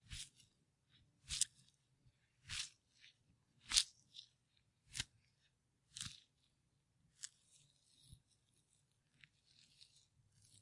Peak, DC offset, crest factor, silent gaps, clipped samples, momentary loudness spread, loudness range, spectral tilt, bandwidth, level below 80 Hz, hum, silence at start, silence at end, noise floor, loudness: -8 dBFS; under 0.1%; 44 dB; none; under 0.1%; 23 LU; 20 LU; 1 dB/octave; 12 kHz; -70 dBFS; none; 0.1 s; 2.45 s; -82 dBFS; -43 LUFS